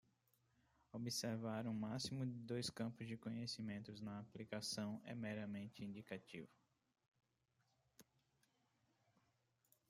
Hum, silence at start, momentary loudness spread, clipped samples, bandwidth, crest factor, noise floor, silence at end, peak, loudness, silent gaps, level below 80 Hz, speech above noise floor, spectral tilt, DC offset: none; 0.95 s; 8 LU; under 0.1%; 15.5 kHz; 18 dB; -85 dBFS; 1.85 s; -32 dBFS; -48 LUFS; 7.08-7.12 s; -82 dBFS; 37 dB; -4.5 dB/octave; under 0.1%